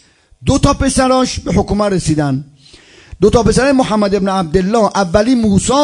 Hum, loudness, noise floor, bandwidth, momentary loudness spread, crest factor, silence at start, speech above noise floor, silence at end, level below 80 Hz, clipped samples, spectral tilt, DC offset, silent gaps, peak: none; -13 LUFS; -42 dBFS; 11 kHz; 5 LU; 12 dB; 0.4 s; 30 dB; 0 s; -28 dBFS; 0.1%; -5.5 dB/octave; under 0.1%; none; 0 dBFS